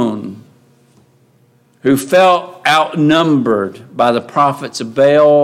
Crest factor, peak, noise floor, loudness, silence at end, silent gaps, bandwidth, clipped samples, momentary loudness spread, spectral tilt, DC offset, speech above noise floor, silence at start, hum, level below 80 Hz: 12 dB; 0 dBFS; -52 dBFS; -13 LUFS; 0 s; none; 16 kHz; under 0.1%; 11 LU; -5.5 dB/octave; under 0.1%; 40 dB; 0 s; none; -60 dBFS